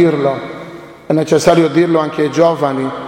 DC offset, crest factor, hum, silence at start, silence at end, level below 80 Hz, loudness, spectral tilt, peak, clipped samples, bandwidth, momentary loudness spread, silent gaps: under 0.1%; 14 dB; none; 0 s; 0 s; -50 dBFS; -13 LUFS; -6 dB/octave; 0 dBFS; under 0.1%; 16 kHz; 15 LU; none